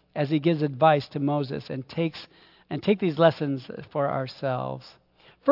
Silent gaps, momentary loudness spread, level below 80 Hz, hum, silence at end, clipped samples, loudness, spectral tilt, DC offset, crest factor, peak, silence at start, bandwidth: none; 13 LU; -68 dBFS; none; 0 s; under 0.1%; -26 LUFS; -9 dB/octave; under 0.1%; 20 dB; -6 dBFS; 0.15 s; 5.8 kHz